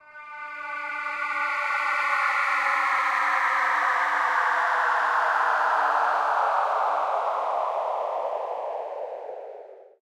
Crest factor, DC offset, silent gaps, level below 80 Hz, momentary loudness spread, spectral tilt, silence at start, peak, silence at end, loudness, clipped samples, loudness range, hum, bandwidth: 14 dB; under 0.1%; none; -78 dBFS; 13 LU; 0 dB/octave; 0.05 s; -10 dBFS; 0.15 s; -24 LUFS; under 0.1%; 4 LU; none; 15.5 kHz